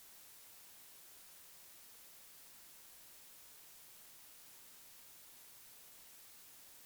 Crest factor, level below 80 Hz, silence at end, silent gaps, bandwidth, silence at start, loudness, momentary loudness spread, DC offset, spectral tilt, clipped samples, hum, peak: 12 dB; -86 dBFS; 0 s; none; over 20 kHz; 0 s; -55 LUFS; 0 LU; under 0.1%; 0.5 dB/octave; under 0.1%; none; -46 dBFS